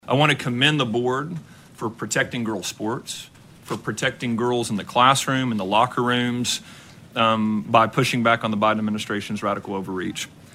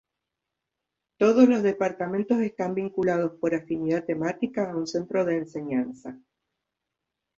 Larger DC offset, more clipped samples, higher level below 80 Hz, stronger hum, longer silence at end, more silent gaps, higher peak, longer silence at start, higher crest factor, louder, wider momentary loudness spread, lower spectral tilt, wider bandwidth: neither; neither; first, -60 dBFS vs -68 dBFS; neither; second, 0.25 s vs 1.2 s; neither; first, -2 dBFS vs -6 dBFS; second, 0.05 s vs 1.2 s; about the same, 22 dB vs 20 dB; first, -22 LUFS vs -25 LUFS; about the same, 12 LU vs 10 LU; second, -4.5 dB/octave vs -7 dB/octave; first, 16 kHz vs 7.6 kHz